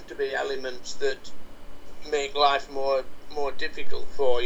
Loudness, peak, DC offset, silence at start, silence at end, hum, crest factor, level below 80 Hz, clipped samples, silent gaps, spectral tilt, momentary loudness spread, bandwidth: -28 LUFS; -8 dBFS; under 0.1%; 0 s; 0 s; none; 16 dB; -46 dBFS; under 0.1%; none; -3 dB/octave; 15 LU; 9.4 kHz